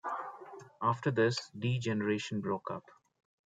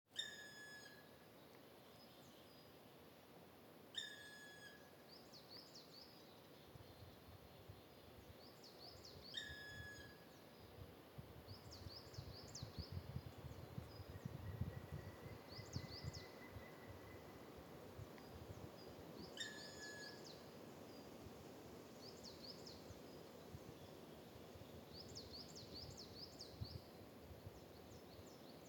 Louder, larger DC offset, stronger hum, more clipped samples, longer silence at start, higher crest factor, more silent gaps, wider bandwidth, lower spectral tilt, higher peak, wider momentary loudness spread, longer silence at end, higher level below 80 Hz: first, -34 LUFS vs -56 LUFS; neither; neither; neither; about the same, 0.05 s vs 0.05 s; second, 18 dB vs 24 dB; neither; second, 9.2 kHz vs 19 kHz; first, -6 dB/octave vs -4 dB/octave; first, -16 dBFS vs -32 dBFS; first, 15 LU vs 11 LU; first, 0.7 s vs 0 s; about the same, -74 dBFS vs -72 dBFS